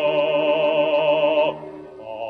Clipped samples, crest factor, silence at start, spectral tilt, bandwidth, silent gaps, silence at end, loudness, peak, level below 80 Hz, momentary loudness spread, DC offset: under 0.1%; 12 dB; 0 s; -6.5 dB/octave; 4.8 kHz; none; 0 s; -19 LUFS; -8 dBFS; -66 dBFS; 18 LU; under 0.1%